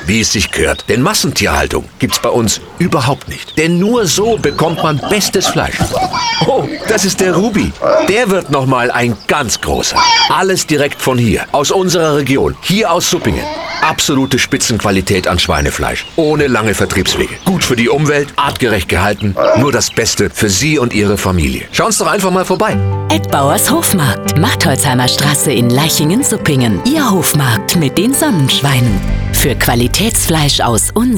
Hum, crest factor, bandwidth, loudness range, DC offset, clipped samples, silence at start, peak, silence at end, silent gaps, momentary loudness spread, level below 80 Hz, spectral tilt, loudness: none; 12 dB; over 20 kHz; 2 LU; under 0.1%; under 0.1%; 0 s; 0 dBFS; 0 s; none; 4 LU; -28 dBFS; -4 dB/octave; -12 LUFS